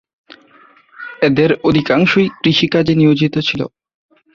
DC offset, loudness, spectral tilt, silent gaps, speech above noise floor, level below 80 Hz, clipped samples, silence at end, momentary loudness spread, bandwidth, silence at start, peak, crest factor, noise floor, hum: under 0.1%; -14 LUFS; -7 dB/octave; none; 35 dB; -48 dBFS; under 0.1%; 0.7 s; 11 LU; 7.2 kHz; 1 s; 0 dBFS; 14 dB; -48 dBFS; none